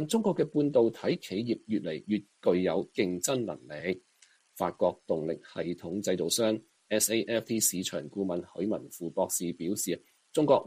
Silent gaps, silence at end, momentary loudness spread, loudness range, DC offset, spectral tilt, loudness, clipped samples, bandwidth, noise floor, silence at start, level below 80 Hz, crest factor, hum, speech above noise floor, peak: none; 0 s; 9 LU; 3 LU; under 0.1%; -4 dB/octave; -31 LUFS; under 0.1%; 15.5 kHz; -63 dBFS; 0 s; -70 dBFS; 20 dB; none; 34 dB; -10 dBFS